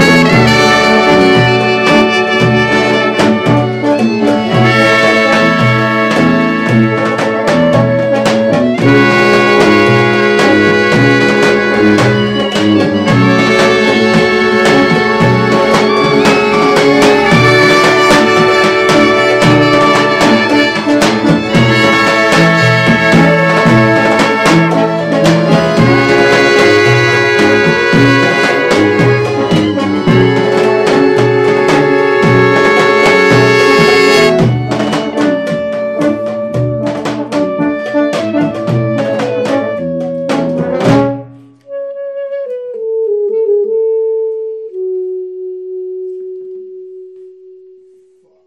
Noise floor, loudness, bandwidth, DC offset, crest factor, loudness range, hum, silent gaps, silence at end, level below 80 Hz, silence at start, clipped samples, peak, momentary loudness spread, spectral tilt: -48 dBFS; -9 LUFS; 15.5 kHz; under 0.1%; 10 dB; 8 LU; none; none; 1.15 s; -40 dBFS; 0 s; 0.3%; 0 dBFS; 9 LU; -5.5 dB/octave